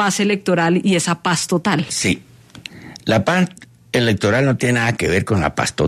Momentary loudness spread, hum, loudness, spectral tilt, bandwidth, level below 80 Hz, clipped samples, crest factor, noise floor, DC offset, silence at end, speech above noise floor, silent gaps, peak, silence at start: 9 LU; none; -18 LUFS; -4.5 dB/octave; 13.5 kHz; -46 dBFS; under 0.1%; 14 dB; -38 dBFS; under 0.1%; 0 s; 21 dB; none; -4 dBFS; 0 s